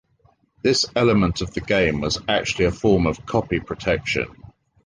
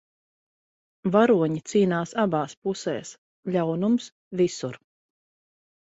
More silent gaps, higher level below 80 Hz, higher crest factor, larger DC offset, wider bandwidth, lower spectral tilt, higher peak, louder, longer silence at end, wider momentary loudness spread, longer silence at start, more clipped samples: second, none vs 2.57-2.62 s, 3.18-3.43 s, 4.12-4.31 s; first, -40 dBFS vs -68 dBFS; about the same, 18 dB vs 20 dB; neither; first, 10 kHz vs 8 kHz; about the same, -5 dB/octave vs -6 dB/octave; about the same, -4 dBFS vs -6 dBFS; first, -21 LUFS vs -25 LUFS; second, 0.4 s vs 1.15 s; second, 7 LU vs 14 LU; second, 0.65 s vs 1.05 s; neither